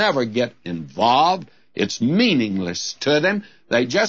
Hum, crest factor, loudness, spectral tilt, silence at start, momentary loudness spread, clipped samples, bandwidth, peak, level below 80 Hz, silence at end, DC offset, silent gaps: none; 16 dB; -20 LUFS; -4.5 dB/octave; 0 s; 10 LU; under 0.1%; 7.8 kHz; -4 dBFS; -62 dBFS; 0 s; 0.2%; none